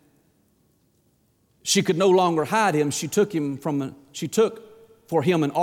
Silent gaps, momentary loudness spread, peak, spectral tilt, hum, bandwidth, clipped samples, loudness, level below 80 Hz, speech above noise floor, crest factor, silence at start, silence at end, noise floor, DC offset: none; 9 LU; -10 dBFS; -4.5 dB/octave; none; 17.5 kHz; under 0.1%; -22 LUFS; -68 dBFS; 43 dB; 14 dB; 1.65 s; 0 s; -65 dBFS; under 0.1%